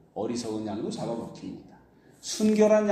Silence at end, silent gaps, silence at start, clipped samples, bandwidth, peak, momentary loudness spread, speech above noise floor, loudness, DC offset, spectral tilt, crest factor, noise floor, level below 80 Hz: 0 s; none; 0.15 s; under 0.1%; 14.5 kHz; -8 dBFS; 20 LU; 29 dB; -27 LUFS; under 0.1%; -5 dB/octave; 18 dB; -56 dBFS; -66 dBFS